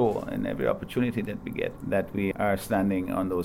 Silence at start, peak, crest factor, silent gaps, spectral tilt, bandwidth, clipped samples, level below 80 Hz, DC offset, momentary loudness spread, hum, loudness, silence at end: 0 s; -12 dBFS; 14 dB; none; -7 dB/octave; 16.5 kHz; under 0.1%; -50 dBFS; under 0.1%; 6 LU; none; -28 LUFS; 0 s